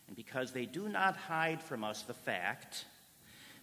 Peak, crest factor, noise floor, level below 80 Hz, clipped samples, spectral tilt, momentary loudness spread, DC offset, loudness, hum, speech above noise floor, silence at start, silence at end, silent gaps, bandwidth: -18 dBFS; 22 dB; -60 dBFS; -80 dBFS; under 0.1%; -4 dB/octave; 20 LU; under 0.1%; -38 LUFS; none; 21 dB; 0.1 s; 0 s; none; 16 kHz